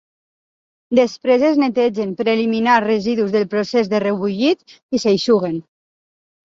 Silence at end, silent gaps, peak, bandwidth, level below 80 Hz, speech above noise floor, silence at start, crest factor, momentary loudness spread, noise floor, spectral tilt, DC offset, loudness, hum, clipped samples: 0.9 s; 4.83-4.89 s; -2 dBFS; 7.8 kHz; -62 dBFS; over 73 dB; 0.9 s; 16 dB; 6 LU; under -90 dBFS; -5.5 dB/octave; under 0.1%; -17 LUFS; none; under 0.1%